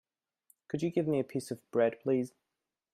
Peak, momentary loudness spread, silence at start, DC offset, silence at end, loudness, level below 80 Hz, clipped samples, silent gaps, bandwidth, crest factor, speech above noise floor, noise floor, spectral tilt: -16 dBFS; 9 LU; 0.75 s; under 0.1%; 0.65 s; -33 LUFS; -76 dBFS; under 0.1%; none; 15 kHz; 18 dB; 39 dB; -71 dBFS; -7 dB/octave